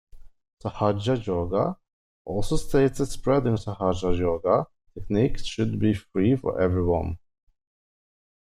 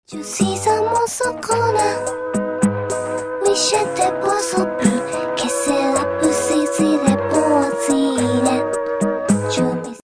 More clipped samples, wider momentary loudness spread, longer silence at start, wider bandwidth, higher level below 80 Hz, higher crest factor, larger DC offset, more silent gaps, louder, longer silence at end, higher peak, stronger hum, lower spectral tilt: neither; first, 12 LU vs 6 LU; about the same, 0.15 s vs 0.1 s; first, 14 kHz vs 11 kHz; first, -40 dBFS vs -52 dBFS; about the same, 18 dB vs 16 dB; neither; first, 0.53-0.57 s, 1.93-2.25 s vs none; second, -25 LUFS vs -18 LUFS; first, 1.35 s vs 0 s; second, -8 dBFS vs -2 dBFS; neither; first, -7 dB/octave vs -4.5 dB/octave